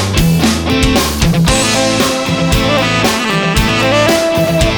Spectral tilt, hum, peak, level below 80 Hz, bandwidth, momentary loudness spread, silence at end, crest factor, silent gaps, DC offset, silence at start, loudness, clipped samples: -4.5 dB/octave; none; 0 dBFS; -22 dBFS; over 20 kHz; 2 LU; 0 s; 12 dB; none; under 0.1%; 0 s; -11 LUFS; under 0.1%